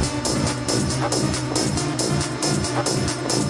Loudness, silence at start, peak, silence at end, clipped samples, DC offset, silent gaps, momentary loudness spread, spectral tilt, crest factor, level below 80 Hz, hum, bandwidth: -22 LUFS; 0 s; -6 dBFS; 0 s; under 0.1%; under 0.1%; none; 1 LU; -4 dB/octave; 16 dB; -42 dBFS; none; 11.5 kHz